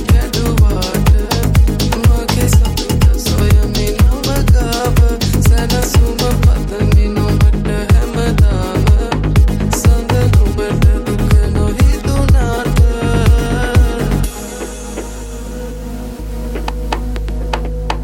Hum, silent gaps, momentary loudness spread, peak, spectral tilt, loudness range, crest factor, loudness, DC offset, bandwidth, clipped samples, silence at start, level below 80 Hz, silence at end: none; none; 12 LU; 0 dBFS; -6 dB/octave; 6 LU; 12 dB; -14 LUFS; under 0.1%; 17 kHz; under 0.1%; 0 s; -14 dBFS; 0 s